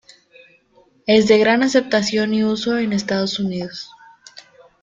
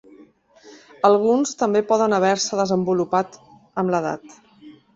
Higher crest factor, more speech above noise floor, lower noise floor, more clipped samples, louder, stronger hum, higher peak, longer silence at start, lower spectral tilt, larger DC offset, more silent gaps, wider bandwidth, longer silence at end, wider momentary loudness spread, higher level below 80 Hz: about the same, 18 dB vs 20 dB; first, 38 dB vs 31 dB; first, -56 dBFS vs -51 dBFS; neither; first, -17 LUFS vs -20 LUFS; neither; about the same, -2 dBFS vs -2 dBFS; first, 1.05 s vs 0.65 s; about the same, -5 dB/octave vs -5 dB/octave; neither; neither; about the same, 7.8 kHz vs 8 kHz; first, 0.4 s vs 0.25 s; first, 16 LU vs 10 LU; first, -58 dBFS vs -64 dBFS